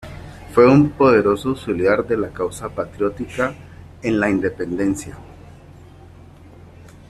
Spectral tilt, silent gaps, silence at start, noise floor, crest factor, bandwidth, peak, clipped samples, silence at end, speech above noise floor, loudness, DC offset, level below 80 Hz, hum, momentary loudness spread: -7 dB/octave; none; 0 s; -43 dBFS; 18 dB; 13 kHz; -2 dBFS; under 0.1%; 1.75 s; 25 dB; -19 LUFS; under 0.1%; -46 dBFS; none; 15 LU